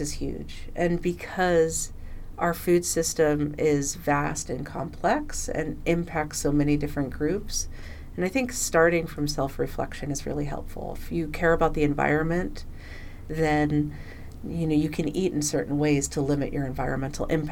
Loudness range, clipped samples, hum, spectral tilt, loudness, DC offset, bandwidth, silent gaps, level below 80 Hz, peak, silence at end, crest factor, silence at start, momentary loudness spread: 2 LU; under 0.1%; none; -5 dB/octave; -26 LUFS; under 0.1%; 18 kHz; none; -38 dBFS; -8 dBFS; 0 s; 18 dB; 0 s; 13 LU